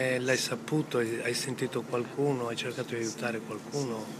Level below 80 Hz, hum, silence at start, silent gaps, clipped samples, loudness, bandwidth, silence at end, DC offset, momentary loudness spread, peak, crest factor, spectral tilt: -76 dBFS; none; 0 s; none; under 0.1%; -32 LUFS; 15.5 kHz; 0 s; under 0.1%; 6 LU; -14 dBFS; 18 dB; -4.5 dB/octave